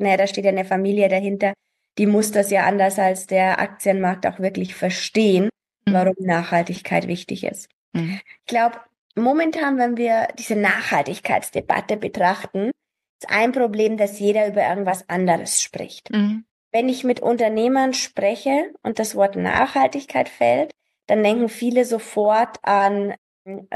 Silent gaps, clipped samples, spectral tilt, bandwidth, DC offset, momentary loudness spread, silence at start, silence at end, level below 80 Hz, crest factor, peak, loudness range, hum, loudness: 7.73-7.92 s, 8.98-9.10 s, 13.09-13.19 s, 16.51-16.71 s, 23.18-23.45 s; under 0.1%; -4.5 dB/octave; 12.5 kHz; under 0.1%; 9 LU; 0 s; 0 s; -62 dBFS; 16 dB; -4 dBFS; 3 LU; none; -20 LUFS